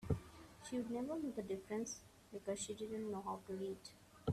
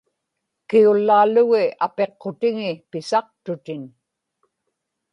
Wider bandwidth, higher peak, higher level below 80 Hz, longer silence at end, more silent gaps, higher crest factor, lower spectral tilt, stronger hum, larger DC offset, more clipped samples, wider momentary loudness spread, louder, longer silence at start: first, 14.5 kHz vs 10 kHz; second, -26 dBFS vs -4 dBFS; first, -64 dBFS vs -72 dBFS; second, 0 s vs 1.25 s; neither; about the same, 20 dB vs 16 dB; about the same, -5.5 dB/octave vs -6 dB/octave; neither; neither; neither; second, 10 LU vs 16 LU; second, -46 LUFS vs -19 LUFS; second, 0 s vs 0.7 s